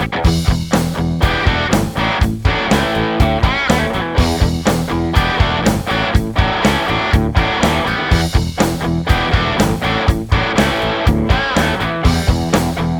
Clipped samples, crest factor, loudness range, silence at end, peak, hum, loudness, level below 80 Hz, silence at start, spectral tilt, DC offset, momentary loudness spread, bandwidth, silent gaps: under 0.1%; 14 dB; 0 LU; 0 s; 0 dBFS; none; -15 LUFS; -22 dBFS; 0 s; -5.5 dB/octave; under 0.1%; 2 LU; over 20 kHz; none